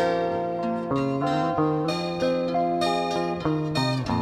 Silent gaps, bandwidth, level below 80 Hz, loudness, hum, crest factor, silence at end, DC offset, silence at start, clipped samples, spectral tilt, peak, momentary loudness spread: none; 13 kHz; -52 dBFS; -25 LUFS; none; 14 dB; 0 s; under 0.1%; 0 s; under 0.1%; -6.5 dB/octave; -10 dBFS; 3 LU